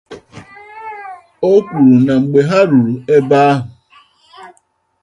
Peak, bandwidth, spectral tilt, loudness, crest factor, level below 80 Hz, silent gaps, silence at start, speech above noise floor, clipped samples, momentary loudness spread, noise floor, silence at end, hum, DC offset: 0 dBFS; 8.6 kHz; -8 dB/octave; -12 LUFS; 14 dB; -54 dBFS; none; 0.1 s; 48 dB; under 0.1%; 21 LU; -58 dBFS; 0.55 s; none; under 0.1%